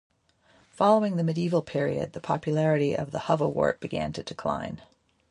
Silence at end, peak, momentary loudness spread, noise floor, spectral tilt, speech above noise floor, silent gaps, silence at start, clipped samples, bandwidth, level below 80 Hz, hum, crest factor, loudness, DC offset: 0.55 s; -8 dBFS; 10 LU; -63 dBFS; -7 dB/octave; 37 dB; none; 0.8 s; under 0.1%; 11 kHz; -58 dBFS; none; 20 dB; -27 LUFS; under 0.1%